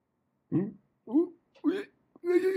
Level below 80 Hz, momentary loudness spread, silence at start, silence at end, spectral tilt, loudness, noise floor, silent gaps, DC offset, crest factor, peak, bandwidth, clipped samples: -80 dBFS; 10 LU; 0.5 s; 0 s; -8 dB/octave; -32 LUFS; -77 dBFS; none; under 0.1%; 16 dB; -14 dBFS; 13 kHz; under 0.1%